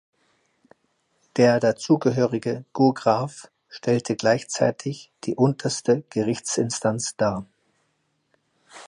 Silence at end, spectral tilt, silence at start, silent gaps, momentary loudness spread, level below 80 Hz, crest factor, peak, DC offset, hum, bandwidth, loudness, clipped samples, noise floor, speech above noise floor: 0 s; -5.5 dB/octave; 1.35 s; none; 13 LU; -64 dBFS; 18 dB; -6 dBFS; under 0.1%; none; 11.5 kHz; -23 LUFS; under 0.1%; -71 dBFS; 49 dB